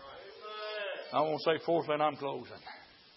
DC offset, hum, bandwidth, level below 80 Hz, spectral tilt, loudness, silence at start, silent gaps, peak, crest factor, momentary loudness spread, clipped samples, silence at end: under 0.1%; none; 5.8 kHz; -78 dBFS; -8.5 dB/octave; -33 LUFS; 0 s; none; -16 dBFS; 20 dB; 18 LU; under 0.1%; 0.25 s